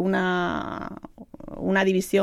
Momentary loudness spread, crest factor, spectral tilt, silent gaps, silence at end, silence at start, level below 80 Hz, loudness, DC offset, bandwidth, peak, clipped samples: 21 LU; 16 dB; -5.5 dB/octave; none; 0 s; 0 s; -52 dBFS; -25 LUFS; under 0.1%; 14.5 kHz; -8 dBFS; under 0.1%